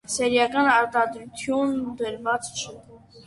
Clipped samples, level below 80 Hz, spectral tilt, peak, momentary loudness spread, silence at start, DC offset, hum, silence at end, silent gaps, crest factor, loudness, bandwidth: under 0.1%; -60 dBFS; -3 dB/octave; -6 dBFS; 13 LU; 0.1 s; under 0.1%; none; 0.05 s; none; 18 dB; -23 LUFS; 11.5 kHz